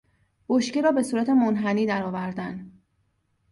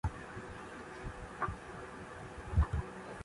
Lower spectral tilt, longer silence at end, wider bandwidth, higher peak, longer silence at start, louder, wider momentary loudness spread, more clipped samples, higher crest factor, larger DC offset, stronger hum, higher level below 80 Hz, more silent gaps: about the same, -6 dB/octave vs -6.5 dB/octave; first, 0.8 s vs 0 s; about the same, 11.5 kHz vs 11.5 kHz; first, -8 dBFS vs -18 dBFS; first, 0.5 s vs 0.05 s; first, -24 LUFS vs -41 LUFS; about the same, 12 LU vs 13 LU; neither; about the same, 16 dB vs 20 dB; neither; neither; second, -64 dBFS vs -42 dBFS; neither